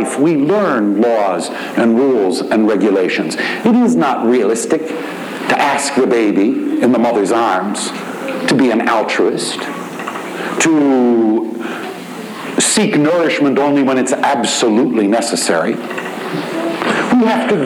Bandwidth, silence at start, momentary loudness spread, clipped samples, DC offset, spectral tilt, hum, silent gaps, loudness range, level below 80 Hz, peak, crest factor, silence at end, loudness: 18.5 kHz; 0 s; 10 LU; under 0.1%; under 0.1%; -4 dB/octave; none; none; 2 LU; -64 dBFS; -2 dBFS; 12 dB; 0 s; -14 LUFS